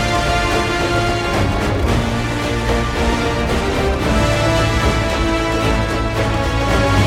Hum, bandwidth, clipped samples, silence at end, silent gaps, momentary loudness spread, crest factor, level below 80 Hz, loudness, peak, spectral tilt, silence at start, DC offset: none; 16 kHz; under 0.1%; 0 s; none; 3 LU; 14 dB; -24 dBFS; -17 LUFS; -2 dBFS; -5.5 dB/octave; 0 s; under 0.1%